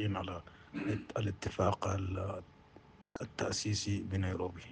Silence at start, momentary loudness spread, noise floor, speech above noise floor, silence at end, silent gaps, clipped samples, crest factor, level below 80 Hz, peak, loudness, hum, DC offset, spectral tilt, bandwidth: 0 s; 13 LU; -60 dBFS; 23 dB; 0 s; none; under 0.1%; 18 dB; -62 dBFS; -18 dBFS; -37 LUFS; none; under 0.1%; -5 dB/octave; 9.8 kHz